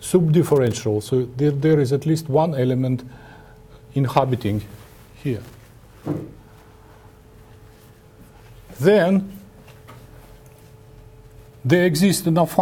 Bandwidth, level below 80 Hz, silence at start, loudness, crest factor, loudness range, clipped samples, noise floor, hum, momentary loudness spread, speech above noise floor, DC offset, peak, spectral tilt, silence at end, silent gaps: 18 kHz; -50 dBFS; 0 s; -20 LUFS; 20 dB; 14 LU; under 0.1%; -47 dBFS; none; 14 LU; 29 dB; under 0.1%; -2 dBFS; -6.5 dB/octave; 0 s; none